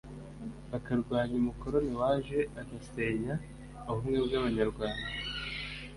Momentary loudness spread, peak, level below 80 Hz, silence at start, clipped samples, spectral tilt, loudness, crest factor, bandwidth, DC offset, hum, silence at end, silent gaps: 14 LU; -16 dBFS; -48 dBFS; 0.05 s; under 0.1%; -6.5 dB/octave; -33 LUFS; 18 dB; 11.5 kHz; under 0.1%; none; 0 s; none